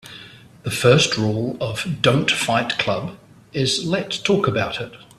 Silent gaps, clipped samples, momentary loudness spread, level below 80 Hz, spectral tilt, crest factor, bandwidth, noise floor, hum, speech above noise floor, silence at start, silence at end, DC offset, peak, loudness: none; under 0.1%; 15 LU; -52 dBFS; -4.5 dB/octave; 20 dB; 14.5 kHz; -43 dBFS; none; 23 dB; 0.05 s; 0.2 s; under 0.1%; -2 dBFS; -20 LUFS